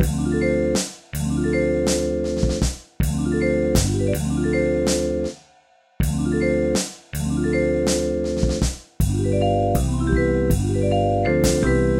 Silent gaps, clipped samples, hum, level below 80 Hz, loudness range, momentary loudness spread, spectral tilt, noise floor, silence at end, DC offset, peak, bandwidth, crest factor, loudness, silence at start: none; under 0.1%; none; -28 dBFS; 2 LU; 6 LU; -5.5 dB/octave; -56 dBFS; 0 s; under 0.1%; -4 dBFS; 16 kHz; 16 dB; -21 LUFS; 0 s